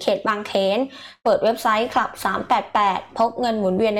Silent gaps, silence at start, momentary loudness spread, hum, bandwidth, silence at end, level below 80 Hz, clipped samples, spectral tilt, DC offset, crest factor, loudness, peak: none; 0 s; 5 LU; none; 18 kHz; 0 s; -58 dBFS; under 0.1%; -5 dB/octave; under 0.1%; 12 dB; -21 LUFS; -8 dBFS